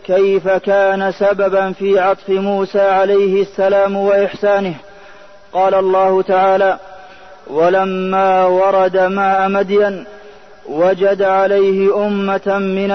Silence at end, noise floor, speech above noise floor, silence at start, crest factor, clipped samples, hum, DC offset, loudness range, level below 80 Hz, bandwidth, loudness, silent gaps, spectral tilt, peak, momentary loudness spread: 0 s; -41 dBFS; 27 dB; 0.05 s; 12 dB; under 0.1%; none; 0.7%; 1 LU; -54 dBFS; 6.2 kHz; -14 LUFS; none; -7 dB/octave; -2 dBFS; 5 LU